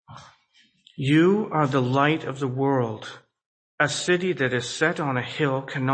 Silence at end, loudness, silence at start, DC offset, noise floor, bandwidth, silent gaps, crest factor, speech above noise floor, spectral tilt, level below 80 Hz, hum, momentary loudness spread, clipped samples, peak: 0 s; -23 LUFS; 0.1 s; under 0.1%; -62 dBFS; 8.8 kHz; 3.46-3.78 s; 20 dB; 39 dB; -5.5 dB/octave; -66 dBFS; none; 8 LU; under 0.1%; -4 dBFS